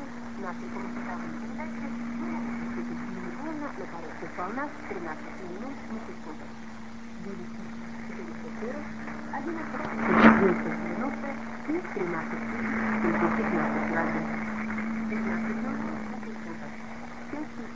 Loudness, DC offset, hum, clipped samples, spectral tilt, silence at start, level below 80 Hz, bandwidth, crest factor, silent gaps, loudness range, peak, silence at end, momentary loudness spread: -31 LUFS; 0.8%; none; under 0.1%; -6.5 dB/octave; 0 s; -54 dBFS; 7.6 kHz; 28 dB; none; 13 LU; -2 dBFS; 0 s; 13 LU